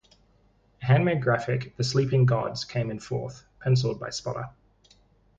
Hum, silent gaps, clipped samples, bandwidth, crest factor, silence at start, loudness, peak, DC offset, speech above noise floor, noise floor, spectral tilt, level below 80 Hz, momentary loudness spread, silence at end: none; none; under 0.1%; 7.8 kHz; 18 dB; 0.8 s; -26 LUFS; -8 dBFS; under 0.1%; 38 dB; -63 dBFS; -6.5 dB/octave; -56 dBFS; 12 LU; 0.9 s